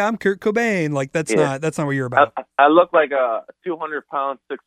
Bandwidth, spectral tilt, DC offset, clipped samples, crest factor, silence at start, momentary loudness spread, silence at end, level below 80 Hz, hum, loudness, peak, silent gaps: 13.5 kHz; -5.5 dB/octave; under 0.1%; under 0.1%; 18 dB; 0 s; 12 LU; 0.1 s; -64 dBFS; none; -19 LUFS; -2 dBFS; none